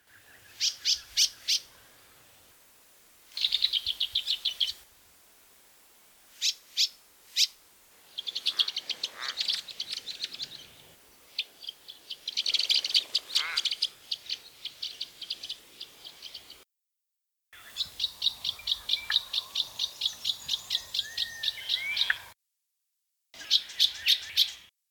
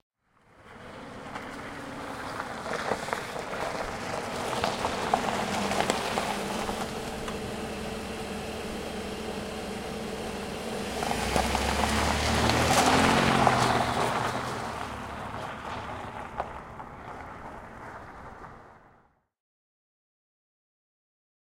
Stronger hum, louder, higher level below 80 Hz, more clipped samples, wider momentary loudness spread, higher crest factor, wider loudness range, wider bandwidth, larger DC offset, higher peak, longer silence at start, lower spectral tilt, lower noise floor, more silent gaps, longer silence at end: neither; about the same, -28 LUFS vs -29 LUFS; second, -70 dBFS vs -46 dBFS; neither; about the same, 17 LU vs 19 LU; about the same, 24 dB vs 24 dB; second, 7 LU vs 17 LU; first, over 20 kHz vs 16 kHz; neither; second, -10 dBFS vs -6 dBFS; about the same, 0.5 s vs 0.6 s; second, 3 dB/octave vs -4 dB/octave; first, -85 dBFS vs -64 dBFS; neither; second, 0.25 s vs 2.7 s